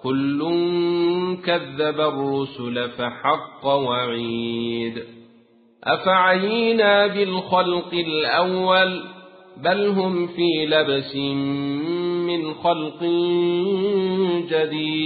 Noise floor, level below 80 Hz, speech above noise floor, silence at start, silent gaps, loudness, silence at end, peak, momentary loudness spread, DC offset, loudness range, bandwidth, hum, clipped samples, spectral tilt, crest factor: -54 dBFS; -62 dBFS; 33 dB; 0.05 s; none; -21 LUFS; 0 s; -4 dBFS; 8 LU; under 0.1%; 4 LU; 4.8 kHz; none; under 0.1%; -10.5 dB/octave; 18 dB